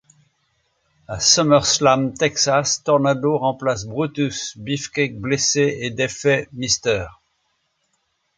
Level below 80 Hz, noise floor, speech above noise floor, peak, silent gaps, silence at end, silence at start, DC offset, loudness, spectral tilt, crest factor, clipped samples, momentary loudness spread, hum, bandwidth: -50 dBFS; -70 dBFS; 50 dB; -2 dBFS; none; 1.25 s; 1.1 s; under 0.1%; -19 LUFS; -3 dB/octave; 20 dB; under 0.1%; 10 LU; none; 10 kHz